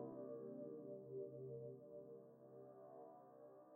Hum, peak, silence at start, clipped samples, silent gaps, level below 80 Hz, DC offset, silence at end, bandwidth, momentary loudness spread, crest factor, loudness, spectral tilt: none; -40 dBFS; 0 s; under 0.1%; none; under -90 dBFS; under 0.1%; 0 s; 1.9 kHz; 10 LU; 16 dB; -56 LUFS; -4 dB/octave